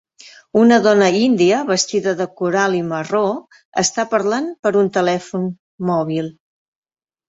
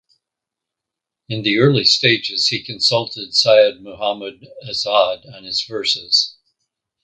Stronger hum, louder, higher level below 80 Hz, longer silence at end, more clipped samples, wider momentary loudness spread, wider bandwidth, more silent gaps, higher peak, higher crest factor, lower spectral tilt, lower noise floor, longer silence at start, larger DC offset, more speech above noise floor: neither; about the same, -17 LUFS vs -16 LUFS; about the same, -62 dBFS vs -60 dBFS; first, 0.95 s vs 0.7 s; neither; about the same, 12 LU vs 13 LU; second, 8.4 kHz vs 9.4 kHz; first, 3.65-3.72 s, 4.59-4.63 s, 5.59-5.78 s vs none; about the same, -2 dBFS vs 0 dBFS; about the same, 16 dB vs 18 dB; about the same, -4.5 dB/octave vs -4 dB/octave; second, -45 dBFS vs -84 dBFS; second, 0.25 s vs 1.3 s; neither; second, 28 dB vs 66 dB